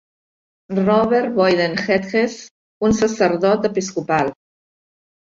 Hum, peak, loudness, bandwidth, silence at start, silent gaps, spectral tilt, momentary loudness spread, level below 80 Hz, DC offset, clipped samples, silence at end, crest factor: none; -4 dBFS; -18 LUFS; 7.8 kHz; 0.7 s; 2.51-2.81 s; -5.5 dB/octave; 7 LU; -50 dBFS; under 0.1%; under 0.1%; 0.9 s; 16 dB